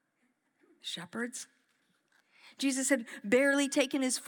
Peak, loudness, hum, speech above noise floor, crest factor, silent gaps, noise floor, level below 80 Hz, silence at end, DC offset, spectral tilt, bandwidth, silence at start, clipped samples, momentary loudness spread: -12 dBFS; -31 LUFS; none; 45 dB; 20 dB; none; -77 dBFS; under -90 dBFS; 0 s; under 0.1%; -2 dB/octave; over 20 kHz; 0.85 s; under 0.1%; 16 LU